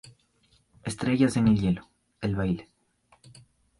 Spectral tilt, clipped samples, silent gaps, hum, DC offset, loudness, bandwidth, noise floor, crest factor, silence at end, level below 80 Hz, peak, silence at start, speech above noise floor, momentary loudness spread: -7 dB/octave; under 0.1%; none; none; under 0.1%; -27 LUFS; 11.5 kHz; -66 dBFS; 18 dB; 1.15 s; -50 dBFS; -10 dBFS; 0.85 s; 41 dB; 12 LU